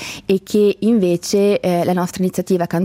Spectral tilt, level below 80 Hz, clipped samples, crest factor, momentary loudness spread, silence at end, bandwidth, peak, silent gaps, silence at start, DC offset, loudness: -6 dB/octave; -54 dBFS; under 0.1%; 12 dB; 5 LU; 0 s; 16 kHz; -4 dBFS; none; 0 s; under 0.1%; -17 LUFS